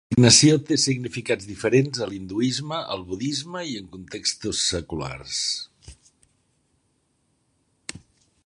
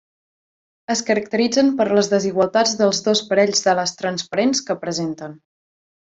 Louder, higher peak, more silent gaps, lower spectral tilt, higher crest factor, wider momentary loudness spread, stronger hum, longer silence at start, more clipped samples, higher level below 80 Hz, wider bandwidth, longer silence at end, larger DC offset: second, -22 LUFS vs -19 LUFS; about the same, -2 dBFS vs -2 dBFS; neither; about the same, -3.5 dB/octave vs -3.5 dB/octave; first, 24 dB vs 18 dB; first, 21 LU vs 8 LU; neither; second, 0.1 s vs 0.9 s; neither; first, -52 dBFS vs -64 dBFS; first, 11 kHz vs 8 kHz; second, 0.45 s vs 0.75 s; neither